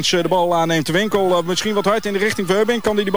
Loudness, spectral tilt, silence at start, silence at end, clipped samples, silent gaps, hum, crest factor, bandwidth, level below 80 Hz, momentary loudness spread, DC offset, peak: -17 LUFS; -4 dB/octave; 0 s; 0 s; under 0.1%; none; none; 12 dB; over 20 kHz; -50 dBFS; 2 LU; 2%; -4 dBFS